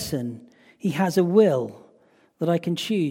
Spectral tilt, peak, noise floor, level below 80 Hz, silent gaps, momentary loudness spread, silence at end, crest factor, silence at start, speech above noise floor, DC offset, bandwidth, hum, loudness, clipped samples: -6.5 dB/octave; -6 dBFS; -59 dBFS; -60 dBFS; none; 15 LU; 0 s; 18 dB; 0 s; 37 dB; under 0.1%; 16.5 kHz; none; -23 LUFS; under 0.1%